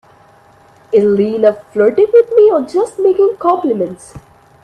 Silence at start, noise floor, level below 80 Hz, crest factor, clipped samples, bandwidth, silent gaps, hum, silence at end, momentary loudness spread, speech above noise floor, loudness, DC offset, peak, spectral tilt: 0.9 s; -45 dBFS; -54 dBFS; 12 dB; under 0.1%; 9.6 kHz; none; none; 0.45 s; 8 LU; 34 dB; -12 LUFS; under 0.1%; 0 dBFS; -7 dB/octave